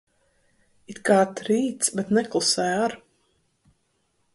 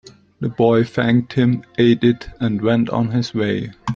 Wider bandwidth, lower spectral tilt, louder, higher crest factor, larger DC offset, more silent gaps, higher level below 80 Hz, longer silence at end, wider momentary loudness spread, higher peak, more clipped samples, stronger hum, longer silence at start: first, 11.5 kHz vs 7.4 kHz; second, -3.5 dB/octave vs -8 dB/octave; second, -23 LUFS vs -18 LUFS; about the same, 20 dB vs 16 dB; neither; neither; second, -66 dBFS vs -48 dBFS; first, 1.35 s vs 0 s; about the same, 9 LU vs 7 LU; second, -6 dBFS vs -2 dBFS; neither; neither; first, 0.9 s vs 0.4 s